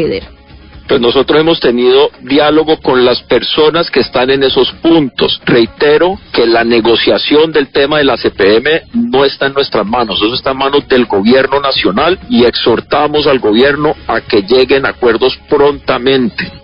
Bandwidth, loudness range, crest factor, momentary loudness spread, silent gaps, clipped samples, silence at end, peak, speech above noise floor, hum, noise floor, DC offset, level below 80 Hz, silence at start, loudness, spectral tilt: 5.4 kHz; 1 LU; 10 dB; 4 LU; none; under 0.1%; 0.05 s; 0 dBFS; 25 dB; none; -34 dBFS; under 0.1%; -38 dBFS; 0 s; -10 LUFS; -8 dB/octave